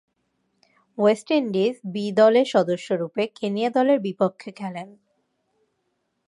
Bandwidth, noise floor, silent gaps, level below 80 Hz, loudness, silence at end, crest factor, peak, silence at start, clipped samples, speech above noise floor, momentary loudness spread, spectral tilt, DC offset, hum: 11.5 kHz; -74 dBFS; none; -76 dBFS; -22 LUFS; 1.4 s; 20 dB; -4 dBFS; 1 s; under 0.1%; 52 dB; 16 LU; -6 dB/octave; under 0.1%; none